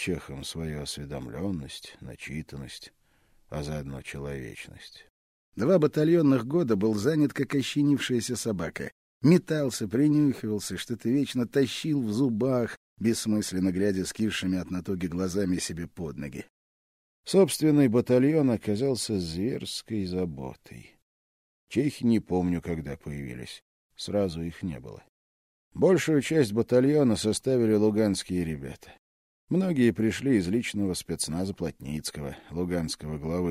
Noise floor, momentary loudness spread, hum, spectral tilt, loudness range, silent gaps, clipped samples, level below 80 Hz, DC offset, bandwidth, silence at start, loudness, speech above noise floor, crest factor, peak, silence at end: -63 dBFS; 17 LU; none; -6 dB/octave; 10 LU; 5.10-5.52 s, 8.92-9.20 s, 12.77-12.97 s, 16.50-17.24 s, 21.02-21.67 s, 23.62-23.90 s, 25.09-25.71 s, 28.99-29.48 s; under 0.1%; -54 dBFS; under 0.1%; 15.5 kHz; 0 s; -27 LUFS; 36 dB; 18 dB; -8 dBFS; 0 s